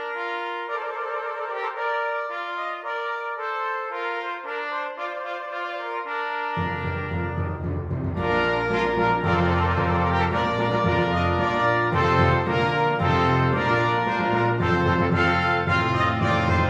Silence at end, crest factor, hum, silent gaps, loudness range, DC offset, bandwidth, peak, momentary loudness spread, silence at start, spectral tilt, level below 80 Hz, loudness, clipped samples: 0 s; 16 dB; none; none; 7 LU; under 0.1%; 8.4 kHz; -8 dBFS; 9 LU; 0 s; -7 dB/octave; -44 dBFS; -24 LUFS; under 0.1%